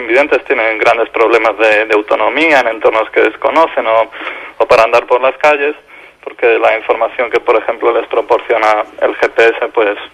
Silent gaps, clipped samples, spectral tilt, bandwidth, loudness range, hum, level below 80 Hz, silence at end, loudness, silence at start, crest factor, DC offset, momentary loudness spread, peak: none; 0.2%; -3.5 dB/octave; 12 kHz; 2 LU; none; -52 dBFS; 0.05 s; -11 LUFS; 0 s; 12 dB; under 0.1%; 5 LU; 0 dBFS